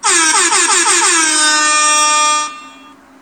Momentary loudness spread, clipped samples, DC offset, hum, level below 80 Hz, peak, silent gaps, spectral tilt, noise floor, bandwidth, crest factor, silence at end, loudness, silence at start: 4 LU; under 0.1%; under 0.1%; none; -62 dBFS; 0 dBFS; none; 2.5 dB/octave; -40 dBFS; over 20 kHz; 12 dB; 0.5 s; -9 LUFS; 0.05 s